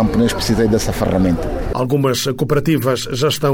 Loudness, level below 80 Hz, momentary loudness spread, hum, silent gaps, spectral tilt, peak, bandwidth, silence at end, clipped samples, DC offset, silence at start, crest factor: -17 LUFS; -30 dBFS; 3 LU; none; none; -5.5 dB/octave; -4 dBFS; 19.5 kHz; 0 s; under 0.1%; under 0.1%; 0 s; 12 dB